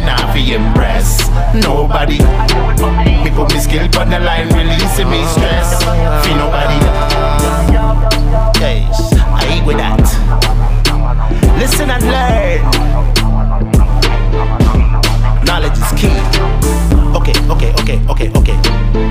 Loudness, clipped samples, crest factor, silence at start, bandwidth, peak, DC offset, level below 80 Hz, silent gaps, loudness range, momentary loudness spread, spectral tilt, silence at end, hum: -12 LUFS; under 0.1%; 10 dB; 0 s; 16 kHz; 0 dBFS; under 0.1%; -12 dBFS; none; 1 LU; 2 LU; -5 dB/octave; 0 s; none